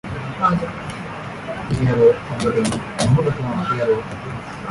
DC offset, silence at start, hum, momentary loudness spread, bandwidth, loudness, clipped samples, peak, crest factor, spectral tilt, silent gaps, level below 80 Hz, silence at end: under 0.1%; 0.05 s; none; 14 LU; 11.5 kHz; -20 LUFS; under 0.1%; -4 dBFS; 16 dB; -6.5 dB/octave; none; -42 dBFS; 0 s